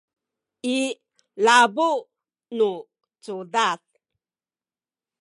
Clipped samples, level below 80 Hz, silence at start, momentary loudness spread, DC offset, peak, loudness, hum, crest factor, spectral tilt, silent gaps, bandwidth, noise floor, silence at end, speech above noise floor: under 0.1%; -86 dBFS; 0.65 s; 19 LU; under 0.1%; -4 dBFS; -22 LUFS; none; 22 dB; -2.5 dB/octave; none; 11.5 kHz; under -90 dBFS; 1.45 s; over 69 dB